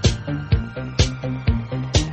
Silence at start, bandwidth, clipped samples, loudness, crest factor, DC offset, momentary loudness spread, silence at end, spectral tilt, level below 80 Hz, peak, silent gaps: 0 s; 9.4 kHz; under 0.1%; -23 LUFS; 18 dB; under 0.1%; 4 LU; 0 s; -5 dB/octave; -28 dBFS; -2 dBFS; none